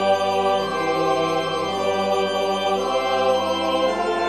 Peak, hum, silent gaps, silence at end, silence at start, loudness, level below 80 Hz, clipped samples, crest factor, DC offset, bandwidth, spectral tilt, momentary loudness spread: -8 dBFS; none; none; 0 s; 0 s; -21 LUFS; -66 dBFS; under 0.1%; 14 dB; 0.3%; 13 kHz; -4 dB/octave; 3 LU